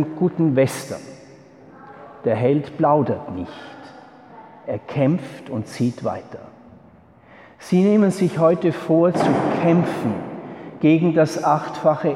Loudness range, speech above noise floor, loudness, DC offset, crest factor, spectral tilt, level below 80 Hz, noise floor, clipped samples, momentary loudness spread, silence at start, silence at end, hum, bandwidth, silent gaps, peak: 8 LU; 30 dB; -20 LUFS; under 0.1%; 16 dB; -7.5 dB/octave; -62 dBFS; -49 dBFS; under 0.1%; 18 LU; 0 s; 0 s; none; 14 kHz; none; -4 dBFS